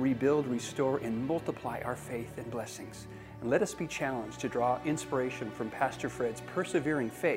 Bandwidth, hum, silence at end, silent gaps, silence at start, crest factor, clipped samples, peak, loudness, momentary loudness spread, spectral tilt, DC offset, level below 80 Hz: 16 kHz; none; 0 s; none; 0 s; 18 dB; under 0.1%; -14 dBFS; -33 LUFS; 9 LU; -5.5 dB/octave; under 0.1%; -62 dBFS